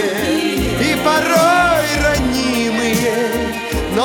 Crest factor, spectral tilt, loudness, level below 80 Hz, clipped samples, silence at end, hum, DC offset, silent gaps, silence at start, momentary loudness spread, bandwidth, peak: 14 dB; -4 dB/octave; -15 LUFS; -30 dBFS; under 0.1%; 0 s; none; under 0.1%; none; 0 s; 7 LU; 19 kHz; -2 dBFS